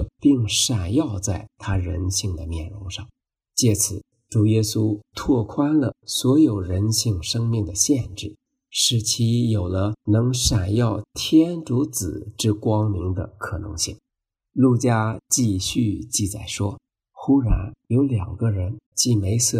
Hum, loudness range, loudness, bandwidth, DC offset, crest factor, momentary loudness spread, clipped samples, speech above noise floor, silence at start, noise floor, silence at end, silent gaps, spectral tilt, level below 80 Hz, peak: none; 3 LU; -22 LUFS; 15.5 kHz; under 0.1%; 16 dB; 10 LU; under 0.1%; 63 dB; 0 s; -84 dBFS; 0 s; 18.86-18.92 s; -5 dB/octave; -38 dBFS; -4 dBFS